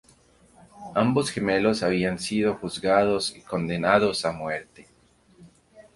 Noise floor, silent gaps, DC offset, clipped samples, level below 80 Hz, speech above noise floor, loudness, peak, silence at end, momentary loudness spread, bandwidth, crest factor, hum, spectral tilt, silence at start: -60 dBFS; none; under 0.1%; under 0.1%; -56 dBFS; 36 dB; -24 LUFS; -4 dBFS; 0.15 s; 9 LU; 11.5 kHz; 22 dB; none; -5 dB/octave; 0.75 s